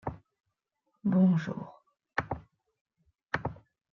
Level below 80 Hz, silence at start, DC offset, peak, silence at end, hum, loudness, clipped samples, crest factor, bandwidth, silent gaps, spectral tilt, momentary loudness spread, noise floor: -60 dBFS; 0.05 s; under 0.1%; -14 dBFS; 0.35 s; none; -32 LUFS; under 0.1%; 20 dB; 6.6 kHz; 2.81-2.85 s; -8.5 dB/octave; 17 LU; -82 dBFS